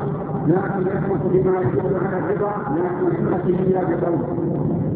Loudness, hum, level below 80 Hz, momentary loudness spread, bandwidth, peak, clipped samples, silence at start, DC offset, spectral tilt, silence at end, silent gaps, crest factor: -21 LUFS; none; -44 dBFS; 4 LU; 4 kHz; -4 dBFS; under 0.1%; 0 s; under 0.1%; -13.5 dB/octave; 0 s; none; 16 dB